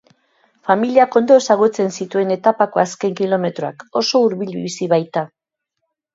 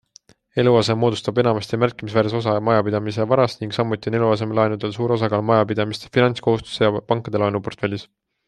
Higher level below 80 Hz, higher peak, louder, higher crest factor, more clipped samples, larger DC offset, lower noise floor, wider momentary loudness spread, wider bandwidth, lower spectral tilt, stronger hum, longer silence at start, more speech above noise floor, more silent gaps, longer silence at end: second, -70 dBFS vs -56 dBFS; about the same, 0 dBFS vs -2 dBFS; first, -17 LUFS vs -20 LUFS; about the same, 16 dB vs 18 dB; neither; neither; first, -77 dBFS vs -53 dBFS; first, 11 LU vs 6 LU; second, 8 kHz vs 10.5 kHz; second, -5 dB/octave vs -7 dB/octave; neither; about the same, 0.65 s vs 0.55 s; first, 61 dB vs 33 dB; neither; first, 0.9 s vs 0.45 s